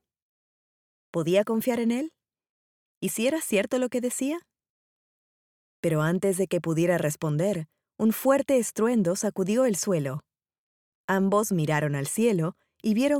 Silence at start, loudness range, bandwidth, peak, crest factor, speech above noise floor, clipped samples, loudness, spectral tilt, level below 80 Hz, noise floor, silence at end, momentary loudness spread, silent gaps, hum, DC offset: 1.15 s; 5 LU; 18.5 kHz; -10 dBFS; 16 dB; over 65 dB; under 0.1%; -26 LUFS; -5.5 dB/octave; -70 dBFS; under -90 dBFS; 0 s; 9 LU; 2.49-3.01 s, 4.70-5.83 s, 10.58-11.08 s; none; under 0.1%